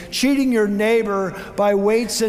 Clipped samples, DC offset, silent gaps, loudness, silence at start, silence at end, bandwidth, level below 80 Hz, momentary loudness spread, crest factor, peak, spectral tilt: under 0.1%; under 0.1%; none; -18 LUFS; 0 s; 0 s; 16 kHz; -48 dBFS; 6 LU; 12 dB; -6 dBFS; -4.5 dB/octave